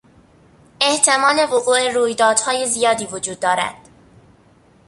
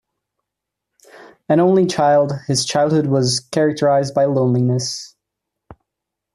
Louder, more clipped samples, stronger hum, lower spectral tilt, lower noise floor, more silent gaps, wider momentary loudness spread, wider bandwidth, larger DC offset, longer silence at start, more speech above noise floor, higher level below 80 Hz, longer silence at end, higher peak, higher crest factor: about the same, -17 LUFS vs -17 LUFS; neither; neither; second, -1 dB/octave vs -5.5 dB/octave; second, -52 dBFS vs -82 dBFS; neither; first, 8 LU vs 5 LU; second, 11.5 kHz vs 13 kHz; neither; second, 0.8 s vs 1.5 s; second, 35 dB vs 66 dB; about the same, -60 dBFS vs -58 dBFS; first, 1.15 s vs 0.6 s; first, 0 dBFS vs -4 dBFS; first, 20 dB vs 14 dB